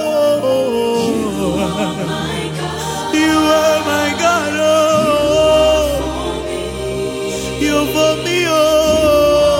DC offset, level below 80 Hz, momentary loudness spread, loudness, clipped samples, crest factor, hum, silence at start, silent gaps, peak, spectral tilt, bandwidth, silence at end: under 0.1%; -34 dBFS; 9 LU; -15 LUFS; under 0.1%; 12 dB; none; 0 s; none; -2 dBFS; -4 dB/octave; 17 kHz; 0 s